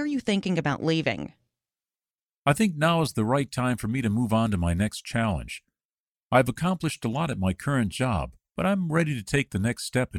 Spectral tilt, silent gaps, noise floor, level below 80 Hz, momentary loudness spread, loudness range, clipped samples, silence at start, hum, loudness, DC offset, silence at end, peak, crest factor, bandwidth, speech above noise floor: -6 dB/octave; 2.25-2.43 s, 5.85-6.15 s, 6.25-6.30 s; under -90 dBFS; -46 dBFS; 6 LU; 2 LU; under 0.1%; 0 s; none; -26 LUFS; under 0.1%; 0 s; -8 dBFS; 18 dB; 16.5 kHz; over 65 dB